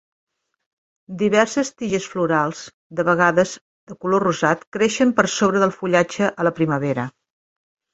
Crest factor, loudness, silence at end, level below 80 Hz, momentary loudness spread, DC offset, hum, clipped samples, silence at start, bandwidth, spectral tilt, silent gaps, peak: 20 dB; -20 LUFS; 0.85 s; -60 dBFS; 9 LU; under 0.1%; none; under 0.1%; 1.1 s; 8.2 kHz; -5 dB/octave; 2.74-2.90 s, 3.61-3.87 s, 4.67-4.72 s; -2 dBFS